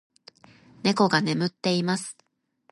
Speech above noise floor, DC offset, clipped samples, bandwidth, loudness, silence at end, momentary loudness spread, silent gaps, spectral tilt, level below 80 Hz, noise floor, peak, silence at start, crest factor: 42 dB; under 0.1%; under 0.1%; 11.5 kHz; -24 LUFS; 0.6 s; 8 LU; none; -5 dB/octave; -68 dBFS; -66 dBFS; -6 dBFS; 0.85 s; 22 dB